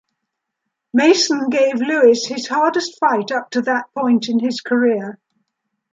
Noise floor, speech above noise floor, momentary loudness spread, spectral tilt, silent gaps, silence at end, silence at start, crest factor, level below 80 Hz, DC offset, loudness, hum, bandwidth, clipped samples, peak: -78 dBFS; 61 dB; 7 LU; -3.5 dB/octave; none; 0.8 s; 0.95 s; 16 dB; -70 dBFS; under 0.1%; -17 LUFS; none; 7.8 kHz; under 0.1%; -2 dBFS